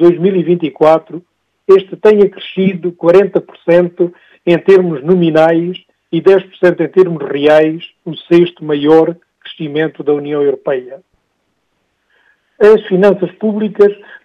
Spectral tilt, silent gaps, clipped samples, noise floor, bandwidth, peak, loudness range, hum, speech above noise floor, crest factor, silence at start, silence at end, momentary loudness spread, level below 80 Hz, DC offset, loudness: -8 dB/octave; none; 0.7%; -64 dBFS; 7 kHz; 0 dBFS; 4 LU; none; 54 dB; 12 dB; 0 s; 0.3 s; 11 LU; -56 dBFS; under 0.1%; -11 LUFS